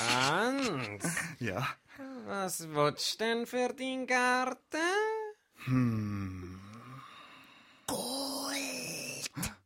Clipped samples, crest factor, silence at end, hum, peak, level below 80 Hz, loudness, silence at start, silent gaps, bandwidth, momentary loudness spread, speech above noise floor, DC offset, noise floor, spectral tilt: under 0.1%; 22 dB; 0.1 s; none; -14 dBFS; -64 dBFS; -33 LUFS; 0 s; none; 16.5 kHz; 18 LU; 26 dB; under 0.1%; -58 dBFS; -4 dB/octave